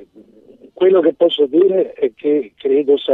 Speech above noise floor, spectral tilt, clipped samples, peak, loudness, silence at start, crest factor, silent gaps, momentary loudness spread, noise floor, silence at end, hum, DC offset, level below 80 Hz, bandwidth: 31 dB; -8 dB/octave; under 0.1%; -2 dBFS; -15 LUFS; 0.8 s; 14 dB; none; 6 LU; -45 dBFS; 0 s; none; under 0.1%; -68 dBFS; 3.9 kHz